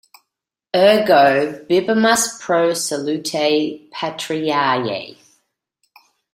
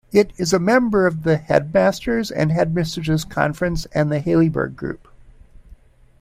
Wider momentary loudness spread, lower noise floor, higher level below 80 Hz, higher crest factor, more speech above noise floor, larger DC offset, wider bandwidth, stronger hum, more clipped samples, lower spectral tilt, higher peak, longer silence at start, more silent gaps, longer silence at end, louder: first, 13 LU vs 8 LU; first, -81 dBFS vs -47 dBFS; second, -64 dBFS vs -42 dBFS; about the same, 18 dB vs 18 dB; first, 65 dB vs 28 dB; neither; about the same, 16 kHz vs 15.5 kHz; neither; neither; second, -3.5 dB/octave vs -6 dB/octave; about the same, -2 dBFS vs -2 dBFS; first, 0.75 s vs 0.15 s; neither; first, 1.25 s vs 0.45 s; about the same, -17 LUFS vs -19 LUFS